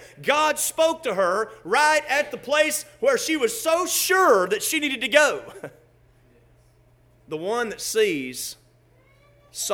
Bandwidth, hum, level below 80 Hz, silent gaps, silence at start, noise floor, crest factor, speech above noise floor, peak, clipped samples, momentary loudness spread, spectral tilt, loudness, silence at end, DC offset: over 20 kHz; none; -64 dBFS; none; 0 s; -57 dBFS; 22 dB; 35 dB; -2 dBFS; under 0.1%; 14 LU; -1.5 dB/octave; -22 LUFS; 0 s; under 0.1%